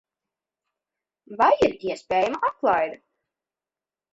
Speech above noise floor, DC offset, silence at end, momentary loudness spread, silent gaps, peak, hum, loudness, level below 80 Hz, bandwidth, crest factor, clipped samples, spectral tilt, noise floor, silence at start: over 68 dB; under 0.1%; 1.15 s; 12 LU; none; -6 dBFS; none; -23 LUFS; -60 dBFS; 8 kHz; 20 dB; under 0.1%; -5 dB/octave; under -90 dBFS; 1.3 s